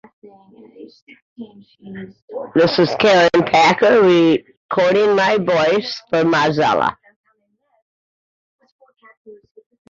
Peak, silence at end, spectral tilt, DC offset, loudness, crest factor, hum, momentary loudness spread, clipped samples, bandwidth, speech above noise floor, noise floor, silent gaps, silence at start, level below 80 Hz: -2 dBFS; 0.55 s; -5.5 dB/octave; under 0.1%; -15 LUFS; 16 dB; none; 18 LU; under 0.1%; 7.6 kHz; 49 dB; -65 dBFS; 1.02-1.07 s, 1.22-1.36 s, 2.22-2.28 s, 4.57-4.69 s, 7.16-7.24 s, 7.82-8.59 s, 8.72-8.79 s, 9.17-9.25 s; 0.8 s; -58 dBFS